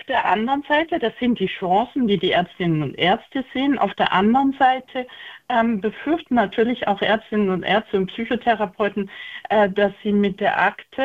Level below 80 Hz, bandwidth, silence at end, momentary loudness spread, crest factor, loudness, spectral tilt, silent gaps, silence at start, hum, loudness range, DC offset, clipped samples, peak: -54 dBFS; 7.6 kHz; 0 s; 6 LU; 16 dB; -20 LUFS; -7.5 dB/octave; none; 0.1 s; none; 1 LU; under 0.1%; under 0.1%; -4 dBFS